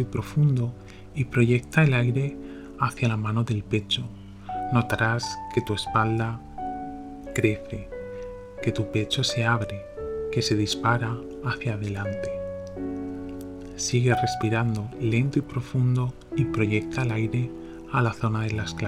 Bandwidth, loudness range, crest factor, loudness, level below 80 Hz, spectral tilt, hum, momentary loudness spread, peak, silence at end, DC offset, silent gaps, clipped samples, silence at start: 13.5 kHz; 4 LU; 20 dB; -26 LUFS; -48 dBFS; -6 dB/octave; none; 13 LU; -6 dBFS; 0 s; under 0.1%; none; under 0.1%; 0 s